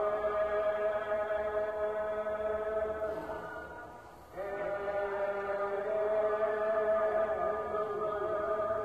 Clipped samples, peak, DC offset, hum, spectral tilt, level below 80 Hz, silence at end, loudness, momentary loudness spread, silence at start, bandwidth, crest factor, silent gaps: under 0.1%; -20 dBFS; under 0.1%; none; -6 dB/octave; -60 dBFS; 0 s; -33 LUFS; 10 LU; 0 s; 8.6 kHz; 12 dB; none